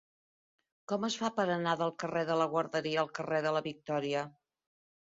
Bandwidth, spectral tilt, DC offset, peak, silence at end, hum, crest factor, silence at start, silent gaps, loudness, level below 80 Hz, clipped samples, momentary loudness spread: 7.6 kHz; -3.5 dB/octave; under 0.1%; -16 dBFS; 0.75 s; none; 18 dB; 0.9 s; none; -33 LUFS; -78 dBFS; under 0.1%; 5 LU